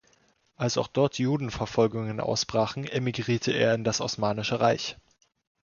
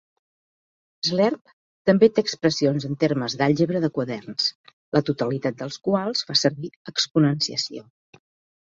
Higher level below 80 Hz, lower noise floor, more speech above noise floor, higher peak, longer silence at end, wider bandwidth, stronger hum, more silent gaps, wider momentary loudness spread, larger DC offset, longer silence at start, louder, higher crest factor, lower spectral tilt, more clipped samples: first, -56 dBFS vs -64 dBFS; second, -66 dBFS vs under -90 dBFS; second, 39 dB vs over 68 dB; second, -10 dBFS vs -4 dBFS; second, 0.7 s vs 0.9 s; about the same, 7.4 kHz vs 7.8 kHz; neither; second, none vs 1.41-1.45 s, 1.53-1.85 s, 4.55-4.64 s, 4.73-4.92 s, 6.76-6.85 s; second, 5 LU vs 9 LU; neither; second, 0.6 s vs 1.05 s; second, -27 LUFS vs -23 LUFS; about the same, 18 dB vs 20 dB; about the same, -5 dB/octave vs -5 dB/octave; neither